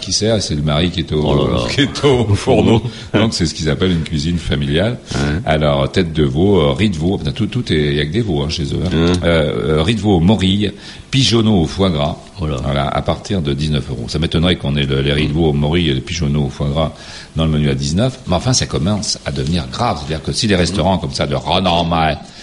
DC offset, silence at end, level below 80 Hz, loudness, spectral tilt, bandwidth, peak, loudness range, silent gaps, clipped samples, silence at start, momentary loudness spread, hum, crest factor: under 0.1%; 0 s; -30 dBFS; -16 LUFS; -5.5 dB/octave; 11.5 kHz; 0 dBFS; 2 LU; none; under 0.1%; 0 s; 6 LU; none; 14 dB